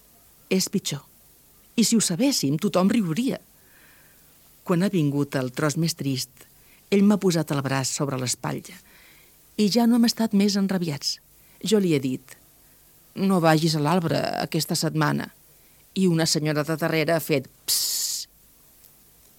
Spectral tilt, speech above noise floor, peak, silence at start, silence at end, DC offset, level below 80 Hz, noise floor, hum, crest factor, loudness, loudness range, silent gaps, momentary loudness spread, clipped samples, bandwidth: -4.5 dB/octave; 32 dB; -4 dBFS; 0.5 s; 1.15 s; under 0.1%; -64 dBFS; -55 dBFS; none; 20 dB; -23 LUFS; 2 LU; none; 11 LU; under 0.1%; 18 kHz